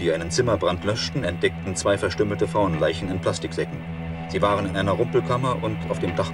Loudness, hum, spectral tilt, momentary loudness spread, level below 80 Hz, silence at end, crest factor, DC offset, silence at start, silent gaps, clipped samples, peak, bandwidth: -24 LUFS; none; -5.5 dB/octave; 6 LU; -44 dBFS; 0 s; 16 dB; under 0.1%; 0 s; none; under 0.1%; -8 dBFS; 12 kHz